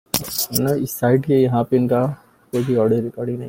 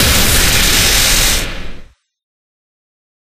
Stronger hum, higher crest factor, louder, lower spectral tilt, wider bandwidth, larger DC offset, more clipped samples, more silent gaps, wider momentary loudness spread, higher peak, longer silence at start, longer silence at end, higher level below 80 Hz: neither; first, 20 dB vs 14 dB; second, -19 LUFS vs -10 LUFS; first, -5.5 dB/octave vs -1.5 dB/octave; about the same, 17 kHz vs 16 kHz; neither; neither; neither; second, 8 LU vs 12 LU; about the same, 0 dBFS vs 0 dBFS; first, 0.15 s vs 0 s; second, 0 s vs 1.4 s; second, -52 dBFS vs -20 dBFS